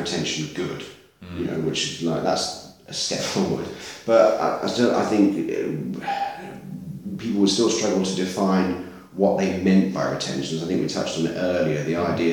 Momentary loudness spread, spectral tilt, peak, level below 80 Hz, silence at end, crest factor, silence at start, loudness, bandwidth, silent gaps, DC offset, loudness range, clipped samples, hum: 13 LU; -5 dB/octave; -4 dBFS; -58 dBFS; 0 s; 18 dB; 0 s; -23 LUFS; 18 kHz; none; under 0.1%; 4 LU; under 0.1%; none